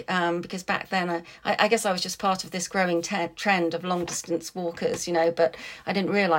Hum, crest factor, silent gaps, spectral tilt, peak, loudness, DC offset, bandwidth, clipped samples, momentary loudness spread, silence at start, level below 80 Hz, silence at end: none; 20 dB; none; -4 dB/octave; -6 dBFS; -26 LUFS; under 0.1%; 16.5 kHz; under 0.1%; 7 LU; 0 s; -64 dBFS; 0 s